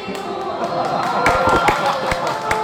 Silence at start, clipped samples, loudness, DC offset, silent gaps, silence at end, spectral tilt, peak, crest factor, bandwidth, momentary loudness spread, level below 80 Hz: 0 s; under 0.1%; -18 LUFS; under 0.1%; none; 0 s; -4.5 dB/octave; -4 dBFS; 16 dB; over 20 kHz; 10 LU; -38 dBFS